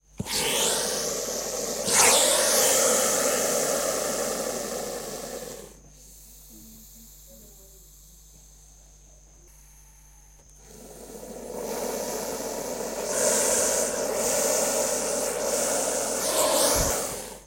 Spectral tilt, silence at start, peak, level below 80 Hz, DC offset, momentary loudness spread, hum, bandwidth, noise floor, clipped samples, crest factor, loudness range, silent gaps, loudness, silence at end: -1 dB/octave; 0.2 s; -6 dBFS; -50 dBFS; under 0.1%; 16 LU; none; 16.5 kHz; -52 dBFS; under 0.1%; 20 dB; 18 LU; none; -24 LUFS; 0 s